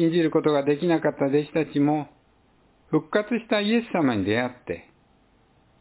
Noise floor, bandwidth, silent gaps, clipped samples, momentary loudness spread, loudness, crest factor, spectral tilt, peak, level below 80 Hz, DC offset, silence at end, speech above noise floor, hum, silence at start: -61 dBFS; 4 kHz; none; under 0.1%; 8 LU; -24 LUFS; 16 dB; -11 dB/octave; -8 dBFS; -60 dBFS; under 0.1%; 1 s; 37 dB; none; 0 s